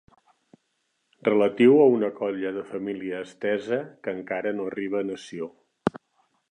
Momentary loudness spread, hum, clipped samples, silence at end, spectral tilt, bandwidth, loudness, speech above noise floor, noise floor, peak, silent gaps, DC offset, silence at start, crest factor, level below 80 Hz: 16 LU; none; under 0.1%; 0.55 s; -7 dB/octave; 9.6 kHz; -25 LUFS; 50 dB; -74 dBFS; -6 dBFS; none; under 0.1%; 1.25 s; 20 dB; -68 dBFS